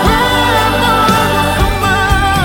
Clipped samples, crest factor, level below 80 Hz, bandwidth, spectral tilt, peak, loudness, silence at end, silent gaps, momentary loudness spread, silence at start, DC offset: under 0.1%; 10 dB; -20 dBFS; 17 kHz; -4.5 dB/octave; 0 dBFS; -11 LUFS; 0 s; none; 2 LU; 0 s; under 0.1%